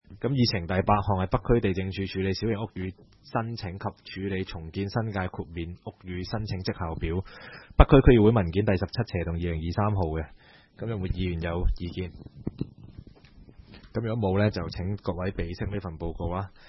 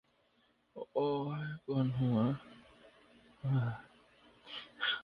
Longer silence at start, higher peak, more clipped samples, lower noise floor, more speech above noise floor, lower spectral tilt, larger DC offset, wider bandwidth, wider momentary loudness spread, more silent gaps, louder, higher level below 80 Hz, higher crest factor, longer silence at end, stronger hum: second, 0.1 s vs 0.75 s; first, 0 dBFS vs -22 dBFS; neither; second, -52 dBFS vs -73 dBFS; second, 25 dB vs 39 dB; about the same, -8.5 dB/octave vs -8.5 dB/octave; neither; first, 6 kHz vs 5.2 kHz; second, 13 LU vs 17 LU; neither; first, -28 LUFS vs -36 LUFS; first, -36 dBFS vs -70 dBFS; first, 26 dB vs 16 dB; first, 0.2 s vs 0 s; neither